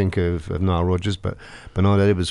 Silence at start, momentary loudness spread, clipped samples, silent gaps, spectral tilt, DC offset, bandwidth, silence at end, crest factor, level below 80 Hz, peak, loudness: 0 s; 13 LU; under 0.1%; none; -7 dB/octave; under 0.1%; 10.5 kHz; 0 s; 14 dB; -38 dBFS; -6 dBFS; -22 LUFS